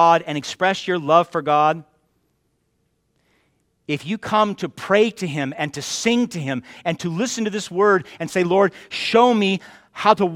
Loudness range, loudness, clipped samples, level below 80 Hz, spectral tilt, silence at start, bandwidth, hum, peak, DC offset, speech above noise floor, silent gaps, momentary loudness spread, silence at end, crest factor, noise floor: 5 LU; -20 LUFS; under 0.1%; -64 dBFS; -4.5 dB/octave; 0 s; 15.5 kHz; none; 0 dBFS; under 0.1%; 49 dB; none; 11 LU; 0 s; 20 dB; -68 dBFS